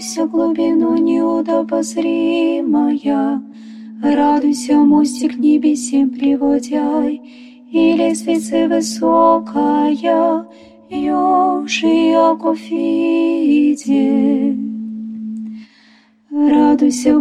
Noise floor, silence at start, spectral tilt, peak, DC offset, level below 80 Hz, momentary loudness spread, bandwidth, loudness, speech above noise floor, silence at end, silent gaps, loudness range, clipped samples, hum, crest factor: -50 dBFS; 0 s; -4.5 dB/octave; -2 dBFS; under 0.1%; -56 dBFS; 12 LU; 12 kHz; -15 LUFS; 36 dB; 0 s; none; 2 LU; under 0.1%; none; 14 dB